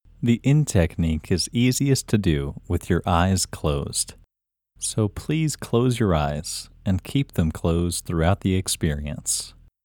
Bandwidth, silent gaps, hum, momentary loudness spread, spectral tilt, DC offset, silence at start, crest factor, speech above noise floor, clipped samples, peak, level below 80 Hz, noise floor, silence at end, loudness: 19.5 kHz; none; none; 8 LU; -5 dB/octave; under 0.1%; 0.2 s; 18 dB; 63 dB; under 0.1%; -4 dBFS; -38 dBFS; -85 dBFS; 0.35 s; -23 LUFS